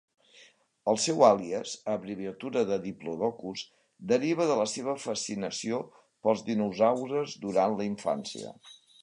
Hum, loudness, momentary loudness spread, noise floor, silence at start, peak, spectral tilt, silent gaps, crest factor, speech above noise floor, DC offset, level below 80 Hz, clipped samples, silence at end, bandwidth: none; -29 LUFS; 13 LU; -59 dBFS; 0.4 s; -6 dBFS; -4.5 dB/octave; none; 22 dB; 31 dB; under 0.1%; -72 dBFS; under 0.1%; 0.3 s; 11 kHz